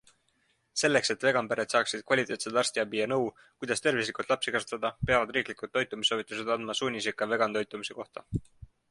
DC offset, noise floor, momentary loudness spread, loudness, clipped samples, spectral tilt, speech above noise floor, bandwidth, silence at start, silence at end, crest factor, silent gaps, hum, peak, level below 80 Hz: under 0.1%; -72 dBFS; 10 LU; -29 LUFS; under 0.1%; -3 dB/octave; 42 dB; 11.5 kHz; 0.75 s; 0.25 s; 20 dB; none; none; -10 dBFS; -58 dBFS